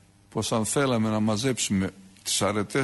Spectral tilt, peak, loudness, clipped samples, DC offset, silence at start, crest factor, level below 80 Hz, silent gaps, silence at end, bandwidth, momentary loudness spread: -4 dB/octave; -12 dBFS; -26 LUFS; under 0.1%; under 0.1%; 0.35 s; 14 dB; -58 dBFS; none; 0 s; 12 kHz; 8 LU